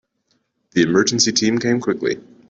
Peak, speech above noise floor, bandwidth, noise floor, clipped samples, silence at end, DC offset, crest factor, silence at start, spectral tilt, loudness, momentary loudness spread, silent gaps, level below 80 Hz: -2 dBFS; 50 dB; 8 kHz; -67 dBFS; under 0.1%; 0.3 s; under 0.1%; 18 dB; 0.75 s; -3.5 dB/octave; -18 LUFS; 8 LU; none; -58 dBFS